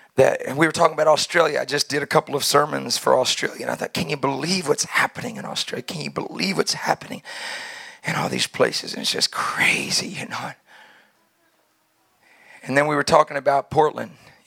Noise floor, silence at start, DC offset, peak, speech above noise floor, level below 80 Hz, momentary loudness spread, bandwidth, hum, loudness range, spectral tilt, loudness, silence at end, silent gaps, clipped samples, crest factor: -65 dBFS; 0.15 s; under 0.1%; 0 dBFS; 43 dB; -64 dBFS; 13 LU; 17.5 kHz; none; 6 LU; -3 dB/octave; -21 LUFS; 0.35 s; none; under 0.1%; 22 dB